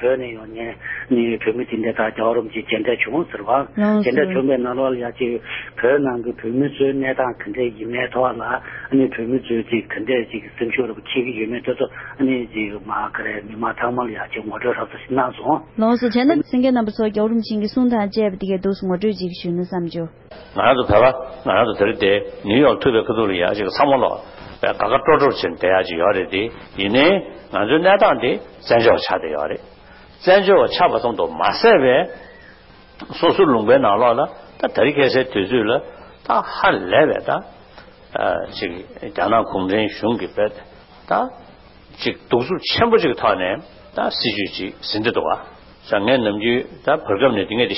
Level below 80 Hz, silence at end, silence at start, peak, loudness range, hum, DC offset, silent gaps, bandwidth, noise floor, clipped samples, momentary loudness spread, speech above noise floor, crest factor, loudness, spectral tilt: -48 dBFS; 0 s; 0 s; -2 dBFS; 5 LU; none; under 0.1%; none; 5.8 kHz; -45 dBFS; under 0.1%; 11 LU; 27 dB; 16 dB; -19 LUFS; -10 dB/octave